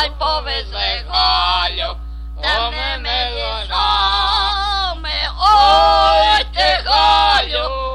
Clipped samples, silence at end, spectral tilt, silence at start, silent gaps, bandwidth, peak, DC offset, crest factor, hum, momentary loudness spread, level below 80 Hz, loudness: under 0.1%; 0 s; -3 dB/octave; 0 s; none; 11.5 kHz; 0 dBFS; under 0.1%; 14 dB; none; 9 LU; -28 dBFS; -15 LUFS